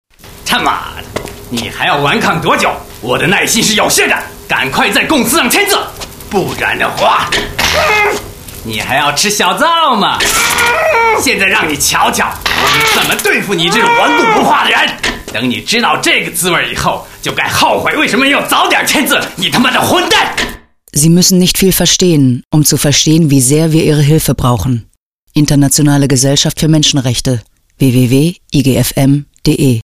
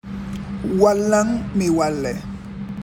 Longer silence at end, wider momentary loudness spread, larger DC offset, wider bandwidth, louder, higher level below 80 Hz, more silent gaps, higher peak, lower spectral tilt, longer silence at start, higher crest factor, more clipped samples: about the same, 0 s vs 0 s; second, 9 LU vs 15 LU; neither; about the same, 16.5 kHz vs 17 kHz; first, -10 LUFS vs -20 LUFS; first, -34 dBFS vs -42 dBFS; first, 22.45-22.51 s, 25.02-25.27 s vs none; about the same, 0 dBFS vs -2 dBFS; second, -3.5 dB/octave vs -6 dB/octave; first, 0.25 s vs 0.05 s; second, 10 dB vs 18 dB; neither